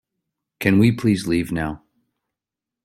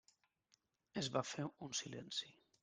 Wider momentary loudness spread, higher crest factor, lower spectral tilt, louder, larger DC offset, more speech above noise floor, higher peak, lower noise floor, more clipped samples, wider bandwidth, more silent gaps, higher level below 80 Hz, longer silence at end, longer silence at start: first, 12 LU vs 7 LU; about the same, 20 dB vs 24 dB; first, -7 dB/octave vs -3.5 dB/octave; first, -20 LUFS vs -44 LUFS; neither; first, 69 dB vs 36 dB; first, -2 dBFS vs -24 dBFS; first, -87 dBFS vs -80 dBFS; neither; first, 15.5 kHz vs 10.5 kHz; neither; first, -48 dBFS vs -80 dBFS; first, 1.05 s vs 0.3 s; second, 0.6 s vs 0.95 s